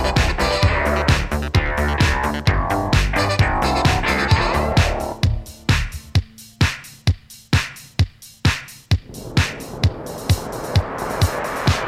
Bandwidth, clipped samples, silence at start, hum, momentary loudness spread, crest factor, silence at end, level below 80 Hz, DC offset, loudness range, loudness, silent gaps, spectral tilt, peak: 15.5 kHz; under 0.1%; 0 s; none; 6 LU; 18 dB; 0 s; -26 dBFS; under 0.1%; 4 LU; -20 LUFS; none; -5 dB/octave; 0 dBFS